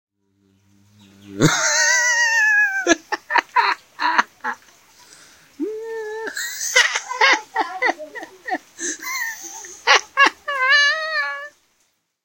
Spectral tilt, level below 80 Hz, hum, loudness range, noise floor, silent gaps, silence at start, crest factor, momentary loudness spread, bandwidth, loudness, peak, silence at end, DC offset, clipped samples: -1.5 dB/octave; -60 dBFS; none; 6 LU; -67 dBFS; none; 1.25 s; 22 dB; 15 LU; 16.5 kHz; -18 LUFS; 0 dBFS; 0.75 s; under 0.1%; under 0.1%